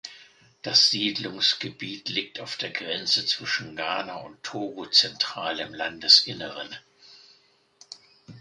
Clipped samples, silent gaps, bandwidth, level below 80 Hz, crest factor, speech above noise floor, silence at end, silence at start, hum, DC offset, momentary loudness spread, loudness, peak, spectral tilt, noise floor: under 0.1%; none; 11.5 kHz; -70 dBFS; 26 dB; 35 dB; 0 s; 0.05 s; none; under 0.1%; 19 LU; -23 LUFS; -2 dBFS; -1.5 dB/octave; -62 dBFS